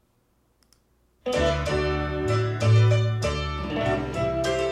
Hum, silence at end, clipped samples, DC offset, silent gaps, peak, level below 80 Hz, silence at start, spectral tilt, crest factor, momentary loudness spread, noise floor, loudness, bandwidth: none; 0 s; under 0.1%; under 0.1%; none; -10 dBFS; -38 dBFS; 1.25 s; -6.5 dB/octave; 16 dB; 9 LU; -66 dBFS; -24 LUFS; 11 kHz